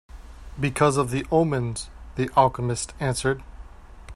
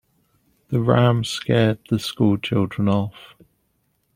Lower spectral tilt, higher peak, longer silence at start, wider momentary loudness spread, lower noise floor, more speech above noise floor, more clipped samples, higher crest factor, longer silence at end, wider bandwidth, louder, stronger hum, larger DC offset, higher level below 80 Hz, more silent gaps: about the same, -5.5 dB/octave vs -6.5 dB/octave; about the same, -4 dBFS vs -2 dBFS; second, 0.15 s vs 0.7 s; first, 12 LU vs 7 LU; second, -43 dBFS vs -68 dBFS; second, 20 dB vs 49 dB; neither; about the same, 22 dB vs 20 dB; second, 0 s vs 0.9 s; second, 14 kHz vs 15.5 kHz; second, -24 LUFS vs -21 LUFS; neither; neither; first, -42 dBFS vs -54 dBFS; neither